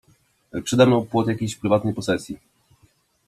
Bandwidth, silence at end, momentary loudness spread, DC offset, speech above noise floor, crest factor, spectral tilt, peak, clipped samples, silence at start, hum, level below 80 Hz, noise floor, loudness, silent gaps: 14 kHz; 0.9 s; 17 LU; under 0.1%; 41 dB; 20 dB; -6 dB/octave; -2 dBFS; under 0.1%; 0.55 s; none; -56 dBFS; -61 dBFS; -21 LUFS; none